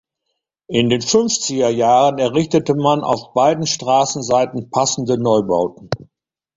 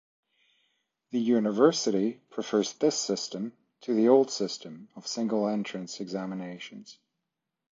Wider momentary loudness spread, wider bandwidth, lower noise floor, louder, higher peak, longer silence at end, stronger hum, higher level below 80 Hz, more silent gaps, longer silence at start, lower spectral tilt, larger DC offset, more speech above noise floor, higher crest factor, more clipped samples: second, 6 LU vs 17 LU; about the same, 7.8 kHz vs 7.6 kHz; second, -76 dBFS vs -85 dBFS; first, -16 LUFS vs -28 LUFS; first, -2 dBFS vs -8 dBFS; second, 0.55 s vs 0.8 s; neither; first, -54 dBFS vs -80 dBFS; neither; second, 0.7 s vs 1.15 s; about the same, -4.5 dB/octave vs -4.5 dB/octave; neither; about the same, 59 dB vs 57 dB; second, 16 dB vs 22 dB; neither